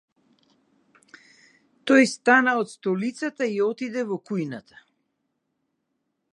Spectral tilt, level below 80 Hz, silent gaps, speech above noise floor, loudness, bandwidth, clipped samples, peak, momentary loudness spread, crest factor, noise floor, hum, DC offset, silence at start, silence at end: -5 dB/octave; -80 dBFS; none; 54 dB; -23 LUFS; 11 kHz; under 0.1%; -4 dBFS; 12 LU; 22 dB; -77 dBFS; none; under 0.1%; 1.85 s; 1.75 s